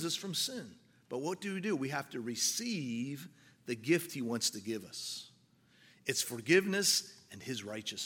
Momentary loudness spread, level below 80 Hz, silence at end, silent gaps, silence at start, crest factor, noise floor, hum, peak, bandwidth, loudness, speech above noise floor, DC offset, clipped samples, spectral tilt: 17 LU; -82 dBFS; 0 s; none; 0 s; 24 dB; -67 dBFS; none; -12 dBFS; 17 kHz; -35 LUFS; 31 dB; under 0.1%; under 0.1%; -3 dB/octave